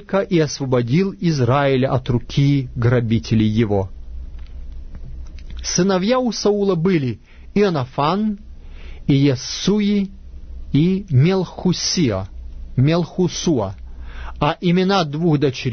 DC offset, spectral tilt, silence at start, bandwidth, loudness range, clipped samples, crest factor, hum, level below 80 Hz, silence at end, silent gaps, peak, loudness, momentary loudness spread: under 0.1%; -6 dB/octave; 0 s; 6.6 kHz; 3 LU; under 0.1%; 14 dB; none; -36 dBFS; 0 s; none; -4 dBFS; -18 LUFS; 20 LU